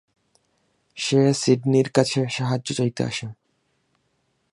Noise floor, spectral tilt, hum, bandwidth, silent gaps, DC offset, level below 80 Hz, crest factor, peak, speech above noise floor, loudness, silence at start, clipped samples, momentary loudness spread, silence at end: -70 dBFS; -5.5 dB/octave; none; 11.5 kHz; none; under 0.1%; -64 dBFS; 22 dB; -2 dBFS; 49 dB; -22 LUFS; 0.95 s; under 0.1%; 11 LU; 1.2 s